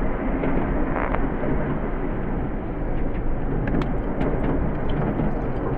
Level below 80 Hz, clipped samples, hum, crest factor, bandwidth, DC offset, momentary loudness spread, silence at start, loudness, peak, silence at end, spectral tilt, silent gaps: -26 dBFS; under 0.1%; none; 18 dB; 3.9 kHz; under 0.1%; 4 LU; 0 s; -26 LUFS; -4 dBFS; 0 s; -10.5 dB/octave; none